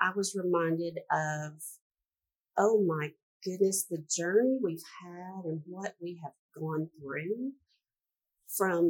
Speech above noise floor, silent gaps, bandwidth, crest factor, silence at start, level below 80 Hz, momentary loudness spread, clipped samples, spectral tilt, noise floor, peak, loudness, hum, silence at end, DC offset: over 58 dB; 1.81-1.90 s, 2.36-2.40 s, 3.22-3.40 s, 6.39-6.49 s; 18 kHz; 22 dB; 0 s; -88 dBFS; 16 LU; under 0.1%; -4.5 dB/octave; under -90 dBFS; -10 dBFS; -32 LUFS; none; 0 s; under 0.1%